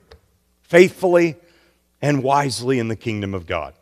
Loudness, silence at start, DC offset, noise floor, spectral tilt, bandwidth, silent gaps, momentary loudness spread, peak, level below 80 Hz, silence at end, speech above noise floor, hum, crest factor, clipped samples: -19 LUFS; 0.7 s; under 0.1%; -61 dBFS; -6 dB/octave; 14.5 kHz; none; 11 LU; 0 dBFS; -52 dBFS; 0.1 s; 43 dB; none; 20 dB; under 0.1%